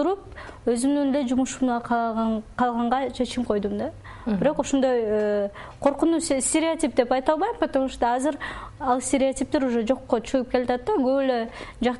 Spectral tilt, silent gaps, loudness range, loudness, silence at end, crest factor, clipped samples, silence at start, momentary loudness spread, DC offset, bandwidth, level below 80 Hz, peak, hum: -4.5 dB/octave; none; 2 LU; -24 LUFS; 0 s; 18 dB; under 0.1%; 0 s; 7 LU; under 0.1%; 11.5 kHz; -48 dBFS; -6 dBFS; none